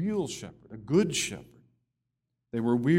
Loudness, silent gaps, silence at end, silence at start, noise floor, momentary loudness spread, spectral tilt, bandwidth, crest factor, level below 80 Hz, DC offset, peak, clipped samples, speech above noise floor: -30 LUFS; none; 0 s; 0 s; -83 dBFS; 19 LU; -5 dB/octave; 16 kHz; 18 dB; -62 dBFS; under 0.1%; -12 dBFS; under 0.1%; 56 dB